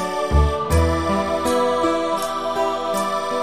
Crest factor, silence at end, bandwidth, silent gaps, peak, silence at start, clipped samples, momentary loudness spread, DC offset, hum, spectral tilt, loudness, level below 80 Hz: 14 dB; 0 s; 15.5 kHz; none; -6 dBFS; 0 s; under 0.1%; 4 LU; 0.6%; none; -5.5 dB/octave; -20 LUFS; -28 dBFS